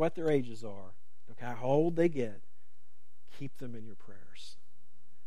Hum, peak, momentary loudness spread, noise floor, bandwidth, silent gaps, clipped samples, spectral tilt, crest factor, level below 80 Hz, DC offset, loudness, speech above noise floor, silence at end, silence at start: none; -16 dBFS; 22 LU; -74 dBFS; 13 kHz; none; under 0.1%; -7.5 dB/octave; 20 dB; -70 dBFS; 2%; -32 LUFS; 40 dB; 0.75 s; 0 s